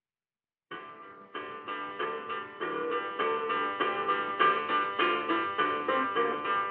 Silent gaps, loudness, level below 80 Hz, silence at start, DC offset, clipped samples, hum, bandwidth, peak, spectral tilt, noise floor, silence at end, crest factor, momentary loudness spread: none; -30 LUFS; -82 dBFS; 0.7 s; under 0.1%; under 0.1%; none; 4.7 kHz; -10 dBFS; -0.5 dB/octave; under -90 dBFS; 0 s; 22 dB; 17 LU